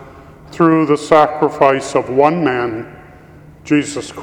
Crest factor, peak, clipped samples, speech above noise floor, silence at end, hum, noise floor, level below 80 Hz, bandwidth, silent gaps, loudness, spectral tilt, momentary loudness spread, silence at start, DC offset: 16 dB; 0 dBFS; under 0.1%; 26 dB; 0 s; none; -40 dBFS; -50 dBFS; 11 kHz; none; -14 LUFS; -6 dB/octave; 11 LU; 0 s; under 0.1%